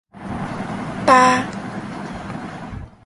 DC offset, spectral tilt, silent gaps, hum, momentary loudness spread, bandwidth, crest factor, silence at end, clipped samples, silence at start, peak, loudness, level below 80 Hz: under 0.1%; -4.5 dB/octave; none; none; 19 LU; 11.5 kHz; 20 dB; 0.15 s; under 0.1%; 0.15 s; 0 dBFS; -19 LUFS; -44 dBFS